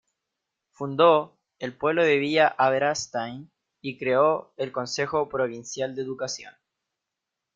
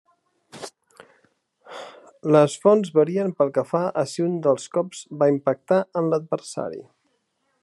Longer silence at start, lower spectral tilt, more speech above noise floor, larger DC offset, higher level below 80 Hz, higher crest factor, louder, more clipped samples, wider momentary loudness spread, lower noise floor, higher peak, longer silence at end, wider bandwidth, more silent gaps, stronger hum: first, 0.8 s vs 0.55 s; second, -4 dB/octave vs -6.5 dB/octave; first, 61 dB vs 50 dB; neither; first, -68 dBFS vs -76 dBFS; about the same, 22 dB vs 20 dB; about the same, -24 LUFS vs -22 LUFS; neither; second, 16 LU vs 21 LU; first, -85 dBFS vs -71 dBFS; about the same, -4 dBFS vs -4 dBFS; first, 1.05 s vs 0.8 s; second, 7.8 kHz vs 12 kHz; neither; neither